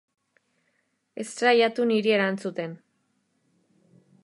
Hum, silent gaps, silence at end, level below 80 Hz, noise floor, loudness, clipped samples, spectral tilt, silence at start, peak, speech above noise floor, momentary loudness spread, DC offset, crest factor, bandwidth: none; none; 1.5 s; -84 dBFS; -73 dBFS; -24 LUFS; under 0.1%; -4.5 dB/octave; 1.15 s; -8 dBFS; 49 dB; 17 LU; under 0.1%; 20 dB; 11.5 kHz